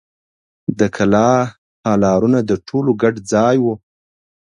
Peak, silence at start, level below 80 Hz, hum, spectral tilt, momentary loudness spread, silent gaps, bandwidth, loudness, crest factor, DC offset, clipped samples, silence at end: 0 dBFS; 0.7 s; -48 dBFS; none; -6.5 dB/octave; 11 LU; 1.58-1.84 s; 10.5 kHz; -16 LUFS; 16 dB; under 0.1%; under 0.1%; 0.7 s